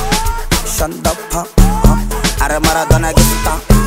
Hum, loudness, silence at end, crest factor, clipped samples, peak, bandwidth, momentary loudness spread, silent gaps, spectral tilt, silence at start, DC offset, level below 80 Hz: none; -14 LUFS; 0 s; 12 dB; under 0.1%; 0 dBFS; 16.5 kHz; 5 LU; none; -4.5 dB/octave; 0 s; under 0.1%; -16 dBFS